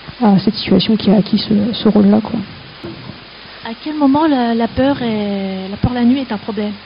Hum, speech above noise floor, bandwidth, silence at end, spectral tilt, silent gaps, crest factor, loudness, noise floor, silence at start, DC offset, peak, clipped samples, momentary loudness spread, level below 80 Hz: none; 21 dB; 5.4 kHz; 0 s; -5.5 dB/octave; none; 14 dB; -15 LUFS; -35 dBFS; 0 s; under 0.1%; 0 dBFS; under 0.1%; 18 LU; -40 dBFS